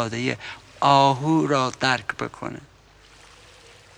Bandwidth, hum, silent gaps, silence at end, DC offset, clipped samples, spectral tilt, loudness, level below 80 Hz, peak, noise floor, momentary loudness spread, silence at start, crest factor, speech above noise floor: 11.5 kHz; none; none; 1.4 s; under 0.1%; under 0.1%; -5 dB/octave; -22 LUFS; -58 dBFS; -4 dBFS; -52 dBFS; 18 LU; 0 s; 20 dB; 30 dB